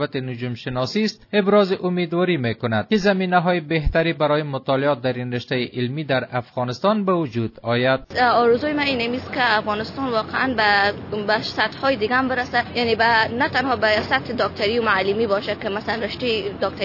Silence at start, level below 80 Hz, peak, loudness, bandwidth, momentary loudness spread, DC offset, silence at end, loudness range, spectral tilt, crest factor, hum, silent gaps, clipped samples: 0 s; -42 dBFS; -4 dBFS; -20 LUFS; 6 kHz; 8 LU; under 0.1%; 0 s; 3 LU; -6.5 dB/octave; 16 dB; none; none; under 0.1%